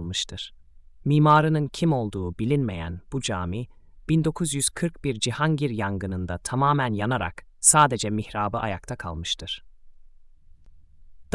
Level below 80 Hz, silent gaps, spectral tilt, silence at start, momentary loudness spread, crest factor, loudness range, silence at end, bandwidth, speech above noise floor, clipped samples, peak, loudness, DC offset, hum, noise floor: -48 dBFS; none; -4.5 dB/octave; 0 s; 15 LU; 24 dB; 4 LU; 0.1 s; 12 kHz; 25 dB; under 0.1%; -2 dBFS; -24 LUFS; under 0.1%; none; -49 dBFS